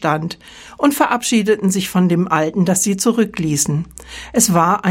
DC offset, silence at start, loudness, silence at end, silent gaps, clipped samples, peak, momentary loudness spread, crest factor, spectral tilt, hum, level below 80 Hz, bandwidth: under 0.1%; 0 s; -16 LUFS; 0 s; none; under 0.1%; 0 dBFS; 9 LU; 16 dB; -4.5 dB/octave; none; -48 dBFS; 16.5 kHz